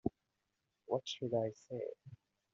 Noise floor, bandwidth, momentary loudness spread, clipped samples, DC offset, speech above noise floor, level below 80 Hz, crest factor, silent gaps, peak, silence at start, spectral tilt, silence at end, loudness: -86 dBFS; 7.8 kHz; 14 LU; under 0.1%; under 0.1%; 46 dB; -72 dBFS; 22 dB; none; -20 dBFS; 0.05 s; -5.5 dB/octave; 0.4 s; -41 LUFS